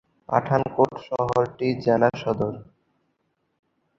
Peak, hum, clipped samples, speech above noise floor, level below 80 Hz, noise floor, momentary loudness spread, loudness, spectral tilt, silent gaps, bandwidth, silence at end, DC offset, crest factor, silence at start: -2 dBFS; none; under 0.1%; 50 dB; -56 dBFS; -73 dBFS; 7 LU; -23 LUFS; -8 dB/octave; none; 7.6 kHz; 1.35 s; under 0.1%; 22 dB; 0.3 s